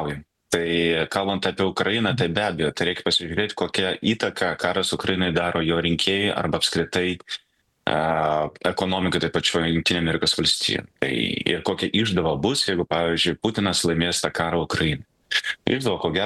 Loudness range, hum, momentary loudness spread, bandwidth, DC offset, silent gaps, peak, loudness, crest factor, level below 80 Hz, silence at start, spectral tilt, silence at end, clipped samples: 2 LU; none; 4 LU; 12.5 kHz; under 0.1%; none; -4 dBFS; -22 LUFS; 20 dB; -48 dBFS; 0 s; -4 dB/octave; 0 s; under 0.1%